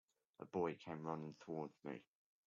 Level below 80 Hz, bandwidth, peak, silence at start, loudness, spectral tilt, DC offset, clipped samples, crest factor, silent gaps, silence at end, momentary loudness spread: -88 dBFS; 7.4 kHz; -30 dBFS; 0.4 s; -48 LUFS; -6.5 dB/octave; under 0.1%; under 0.1%; 20 dB; none; 0.45 s; 10 LU